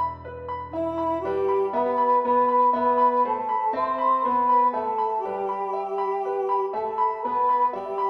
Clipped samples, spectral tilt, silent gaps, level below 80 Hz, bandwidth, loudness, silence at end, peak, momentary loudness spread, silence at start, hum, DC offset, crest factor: under 0.1%; -7.5 dB/octave; none; -58 dBFS; 5.4 kHz; -23 LUFS; 0 s; -10 dBFS; 8 LU; 0 s; none; under 0.1%; 14 dB